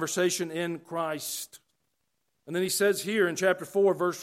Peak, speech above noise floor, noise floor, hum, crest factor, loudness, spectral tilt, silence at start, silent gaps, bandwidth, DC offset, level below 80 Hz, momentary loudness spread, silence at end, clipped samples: -12 dBFS; 52 dB; -80 dBFS; none; 18 dB; -28 LUFS; -3.5 dB/octave; 0 s; none; 16.5 kHz; under 0.1%; -78 dBFS; 9 LU; 0 s; under 0.1%